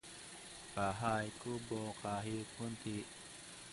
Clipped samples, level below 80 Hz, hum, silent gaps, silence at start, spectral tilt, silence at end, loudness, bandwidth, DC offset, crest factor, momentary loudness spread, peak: under 0.1%; -66 dBFS; none; none; 0.05 s; -4.5 dB/octave; 0 s; -43 LUFS; 11.5 kHz; under 0.1%; 20 dB; 13 LU; -22 dBFS